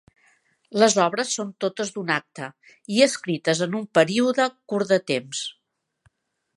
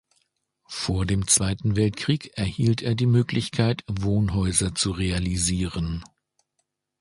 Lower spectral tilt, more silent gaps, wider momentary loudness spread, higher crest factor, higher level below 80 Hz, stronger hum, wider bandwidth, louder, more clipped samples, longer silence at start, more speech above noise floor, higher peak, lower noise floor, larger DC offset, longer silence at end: about the same, -3.5 dB/octave vs -4.5 dB/octave; neither; first, 12 LU vs 9 LU; about the same, 22 dB vs 20 dB; second, -74 dBFS vs -40 dBFS; neither; about the same, 11.5 kHz vs 11.5 kHz; about the same, -23 LUFS vs -24 LUFS; neither; about the same, 0.7 s vs 0.7 s; second, 43 dB vs 53 dB; first, -2 dBFS vs -6 dBFS; second, -66 dBFS vs -76 dBFS; neither; about the same, 1.05 s vs 0.95 s